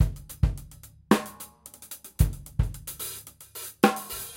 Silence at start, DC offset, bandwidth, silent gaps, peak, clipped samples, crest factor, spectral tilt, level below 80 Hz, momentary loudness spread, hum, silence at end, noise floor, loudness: 0 s; under 0.1%; 17 kHz; none; -4 dBFS; under 0.1%; 24 dB; -5.5 dB/octave; -34 dBFS; 18 LU; none; 0 s; -49 dBFS; -28 LUFS